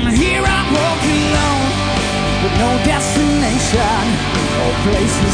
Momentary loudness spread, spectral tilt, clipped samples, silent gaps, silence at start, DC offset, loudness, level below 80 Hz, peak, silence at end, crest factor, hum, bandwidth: 3 LU; -4.5 dB/octave; under 0.1%; none; 0 s; 0.2%; -15 LUFS; -24 dBFS; 0 dBFS; 0 s; 14 dB; none; 10.5 kHz